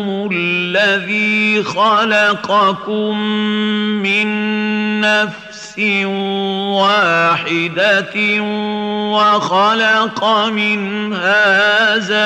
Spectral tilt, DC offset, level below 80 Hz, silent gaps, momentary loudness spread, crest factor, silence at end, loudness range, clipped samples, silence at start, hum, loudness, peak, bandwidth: -4.5 dB/octave; under 0.1%; -62 dBFS; none; 7 LU; 12 dB; 0 s; 3 LU; under 0.1%; 0 s; none; -14 LUFS; -2 dBFS; 9.4 kHz